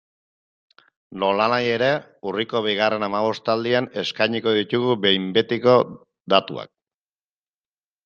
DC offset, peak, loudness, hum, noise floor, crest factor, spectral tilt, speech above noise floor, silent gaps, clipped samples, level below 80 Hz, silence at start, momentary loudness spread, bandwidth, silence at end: under 0.1%; -2 dBFS; -21 LUFS; none; under -90 dBFS; 20 dB; -6 dB/octave; over 69 dB; 6.20-6.24 s; under 0.1%; -66 dBFS; 1.1 s; 8 LU; 7.2 kHz; 1.4 s